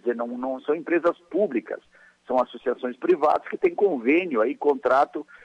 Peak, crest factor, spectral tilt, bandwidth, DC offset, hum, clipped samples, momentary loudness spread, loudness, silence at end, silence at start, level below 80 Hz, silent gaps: -10 dBFS; 14 dB; -7 dB/octave; 7.8 kHz; under 0.1%; none; under 0.1%; 8 LU; -24 LUFS; 0.1 s; 0.05 s; -68 dBFS; none